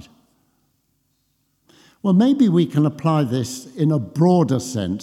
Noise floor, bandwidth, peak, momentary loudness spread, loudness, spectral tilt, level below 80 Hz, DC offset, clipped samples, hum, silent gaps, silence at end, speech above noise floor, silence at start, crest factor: -67 dBFS; 14 kHz; -4 dBFS; 9 LU; -19 LUFS; -7.5 dB/octave; -64 dBFS; under 0.1%; under 0.1%; none; none; 0 s; 50 dB; 2.05 s; 14 dB